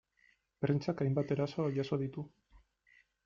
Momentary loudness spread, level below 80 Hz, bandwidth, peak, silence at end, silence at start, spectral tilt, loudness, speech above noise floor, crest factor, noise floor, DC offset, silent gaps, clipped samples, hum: 8 LU; -70 dBFS; 7.2 kHz; -18 dBFS; 0.65 s; 0.6 s; -8.5 dB/octave; -35 LUFS; 37 dB; 18 dB; -72 dBFS; under 0.1%; none; under 0.1%; none